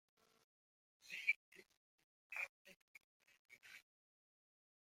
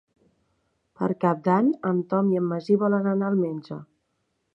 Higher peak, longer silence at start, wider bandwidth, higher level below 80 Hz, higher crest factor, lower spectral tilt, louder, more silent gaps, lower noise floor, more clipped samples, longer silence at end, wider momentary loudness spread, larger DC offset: second, -26 dBFS vs -8 dBFS; about the same, 1.05 s vs 1 s; first, 16.5 kHz vs 6 kHz; second, under -90 dBFS vs -72 dBFS; first, 28 dB vs 18 dB; second, 0.5 dB/octave vs -10 dB/octave; second, -44 LUFS vs -24 LUFS; first, 1.36-1.52 s, 1.77-1.98 s, 2.04-2.30 s, 2.49-2.65 s, 2.76-2.95 s, 3.04-3.20 s, 3.39-3.45 s vs none; first, under -90 dBFS vs -74 dBFS; neither; first, 1.05 s vs 0.75 s; first, 26 LU vs 9 LU; neither